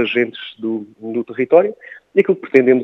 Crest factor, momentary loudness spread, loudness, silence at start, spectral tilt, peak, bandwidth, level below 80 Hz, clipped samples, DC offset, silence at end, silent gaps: 16 dB; 12 LU; -17 LUFS; 0 s; -7.5 dB/octave; 0 dBFS; 5.6 kHz; -72 dBFS; under 0.1%; under 0.1%; 0 s; none